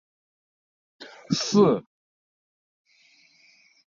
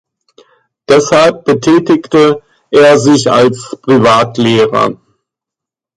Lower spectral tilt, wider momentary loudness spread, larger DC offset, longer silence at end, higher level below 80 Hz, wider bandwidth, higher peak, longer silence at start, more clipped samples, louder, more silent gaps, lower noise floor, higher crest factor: about the same, -5.5 dB/octave vs -5 dB/octave; first, 26 LU vs 6 LU; neither; first, 2.2 s vs 1.05 s; second, -68 dBFS vs -48 dBFS; second, 7.4 kHz vs 11.5 kHz; second, -8 dBFS vs 0 dBFS; about the same, 1 s vs 0.9 s; neither; second, -22 LUFS vs -9 LUFS; neither; second, -60 dBFS vs -84 dBFS; first, 20 dB vs 10 dB